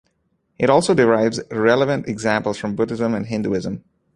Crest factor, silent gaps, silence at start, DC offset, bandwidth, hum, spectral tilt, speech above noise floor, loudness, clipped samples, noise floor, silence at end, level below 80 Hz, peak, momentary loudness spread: 18 dB; none; 0.6 s; under 0.1%; 11 kHz; none; -5.5 dB/octave; 49 dB; -19 LUFS; under 0.1%; -68 dBFS; 0.35 s; -54 dBFS; -2 dBFS; 9 LU